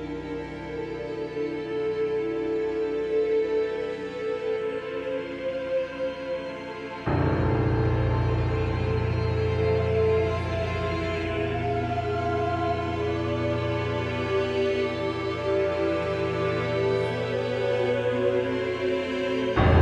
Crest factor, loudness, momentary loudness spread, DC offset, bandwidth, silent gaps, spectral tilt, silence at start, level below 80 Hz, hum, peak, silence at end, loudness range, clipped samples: 18 dB; -27 LUFS; 7 LU; under 0.1%; 8.8 kHz; none; -7.5 dB/octave; 0 s; -42 dBFS; none; -8 dBFS; 0 s; 4 LU; under 0.1%